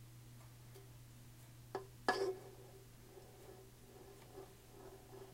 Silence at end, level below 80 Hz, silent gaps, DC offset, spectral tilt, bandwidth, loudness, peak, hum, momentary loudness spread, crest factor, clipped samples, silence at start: 0 s; -68 dBFS; none; under 0.1%; -4.5 dB/octave; 16 kHz; -48 LUFS; -20 dBFS; none; 19 LU; 30 dB; under 0.1%; 0 s